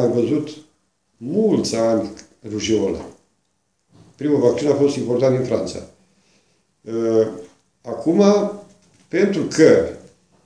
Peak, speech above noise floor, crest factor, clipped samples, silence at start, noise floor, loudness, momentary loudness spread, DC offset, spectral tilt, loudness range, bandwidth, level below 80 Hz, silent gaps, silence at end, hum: 0 dBFS; 52 dB; 20 dB; under 0.1%; 0 s; -69 dBFS; -19 LUFS; 19 LU; under 0.1%; -6 dB/octave; 4 LU; 10.5 kHz; -56 dBFS; none; 0.45 s; none